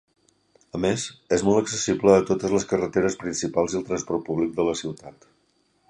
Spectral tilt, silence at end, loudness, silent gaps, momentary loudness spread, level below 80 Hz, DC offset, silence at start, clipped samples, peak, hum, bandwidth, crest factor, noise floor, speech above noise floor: -5 dB/octave; 0.8 s; -24 LUFS; none; 10 LU; -54 dBFS; under 0.1%; 0.75 s; under 0.1%; -4 dBFS; none; 10.5 kHz; 20 dB; -67 dBFS; 43 dB